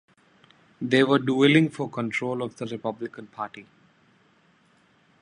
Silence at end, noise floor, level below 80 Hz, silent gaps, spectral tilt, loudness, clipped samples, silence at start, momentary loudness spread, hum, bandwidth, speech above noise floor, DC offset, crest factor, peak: 1.6 s; -62 dBFS; -70 dBFS; none; -6.5 dB/octave; -24 LUFS; under 0.1%; 0.8 s; 17 LU; none; 10.5 kHz; 38 dB; under 0.1%; 22 dB; -6 dBFS